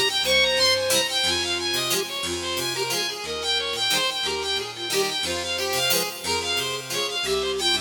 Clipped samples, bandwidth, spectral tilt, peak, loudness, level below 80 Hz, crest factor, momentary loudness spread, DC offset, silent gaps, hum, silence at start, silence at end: under 0.1%; 19 kHz; -1 dB/octave; -8 dBFS; -22 LUFS; -54 dBFS; 16 dB; 7 LU; under 0.1%; none; none; 0 s; 0 s